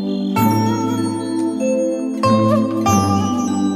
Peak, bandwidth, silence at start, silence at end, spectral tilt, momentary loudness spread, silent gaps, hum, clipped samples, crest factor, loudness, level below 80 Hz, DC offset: -2 dBFS; 16 kHz; 0 s; 0 s; -6 dB/octave; 6 LU; none; none; under 0.1%; 14 dB; -17 LUFS; -52 dBFS; under 0.1%